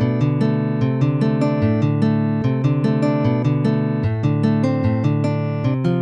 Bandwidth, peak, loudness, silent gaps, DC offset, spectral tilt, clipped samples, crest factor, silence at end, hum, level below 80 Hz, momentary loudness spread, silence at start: 7.6 kHz; -6 dBFS; -19 LUFS; none; under 0.1%; -9.5 dB/octave; under 0.1%; 12 dB; 0 s; none; -48 dBFS; 2 LU; 0 s